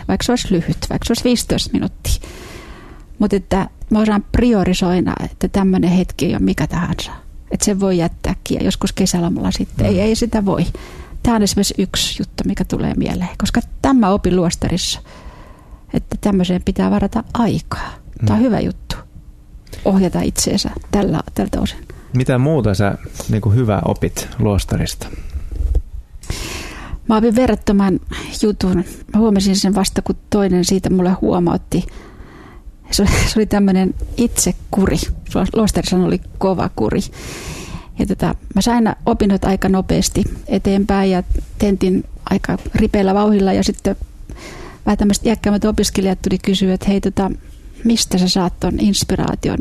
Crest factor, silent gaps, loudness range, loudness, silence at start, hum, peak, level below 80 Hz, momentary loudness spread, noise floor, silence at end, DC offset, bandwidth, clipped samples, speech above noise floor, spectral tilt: 16 dB; none; 3 LU; -17 LUFS; 0 s; none; 0 dBFS; -28 dBFS; 11 LU; -38 dBFS; 0 s; under 0.1%; 14 kHz; under 0.1%; 22 dB; -5.5 dB/octave